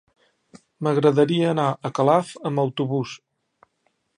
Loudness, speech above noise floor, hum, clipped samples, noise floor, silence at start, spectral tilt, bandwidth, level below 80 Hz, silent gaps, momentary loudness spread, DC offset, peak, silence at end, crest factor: -22 LUFS; 50 dB; none; under 0.1%; -70 dBFS; 0.8 s; -7 dB/octave; 10.5 kHz; -70 dBFS; none; 10 LU; under 0.1%; -2 dBFS; 1 s; 20 dB